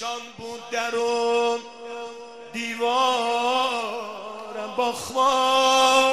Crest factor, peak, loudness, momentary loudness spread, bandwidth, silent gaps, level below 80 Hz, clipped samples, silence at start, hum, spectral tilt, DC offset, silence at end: 18 dB; -6 dBFS; -22 LUFS; 18 LU; 13.5 kHz; none; -66 dBFS; under 0.1%; 0 s; none; -1 dB/octave; 0.2%; 0 s